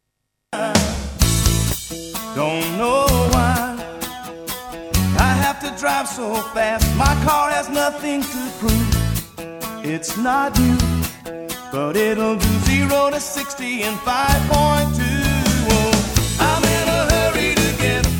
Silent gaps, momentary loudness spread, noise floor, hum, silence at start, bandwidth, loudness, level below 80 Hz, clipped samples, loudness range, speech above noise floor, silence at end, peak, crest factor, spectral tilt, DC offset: none; 11 LU; -75 dBFS; none; 0.5 s; over 20 kHz; -18 LUFS; -28 dBFS; under 0.1%; 4 LU; 57 dB; 0 s; 0 dBFS; 18 dB; -4.5 dB/octave; under 0.1%